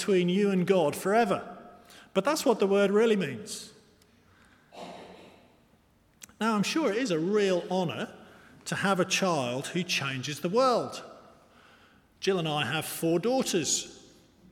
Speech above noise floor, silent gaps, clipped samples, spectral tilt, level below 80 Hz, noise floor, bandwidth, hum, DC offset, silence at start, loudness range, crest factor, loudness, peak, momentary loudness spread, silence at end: 37 dB; none; under 0.1%; -4.5 dB/octave; -70 dBFS; -64 dBFS; 18 kHz; none; under 0.1%; 0 s; 6 LU; 18 dB; -27 LUFS; -10 dBFS; 18 LU; 0.55 s